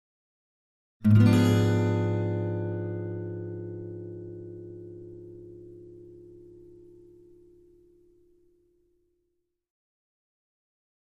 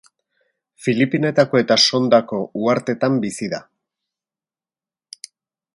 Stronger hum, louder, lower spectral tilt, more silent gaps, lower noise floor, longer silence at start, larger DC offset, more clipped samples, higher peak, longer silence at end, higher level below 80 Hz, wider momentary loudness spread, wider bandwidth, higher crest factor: neither; second, -26 LUFS vs -18 LUFS; first, -8 dB/octave vs -4.5 dB/octave; neither; second, -78 dBFS vs under -90 dBFS; first, 1 s vs 0.8 s; neither; neither; second, -10 dBFS vs 0 dBFS; first, 4.75 s vs 2.15 s; first, -58 dBFS vs -64 dBFS; first, 27 LU vs 16 LU; about the same, 12 kHz vs 11.5 kHz; about the same, 20 dB vs 20 dB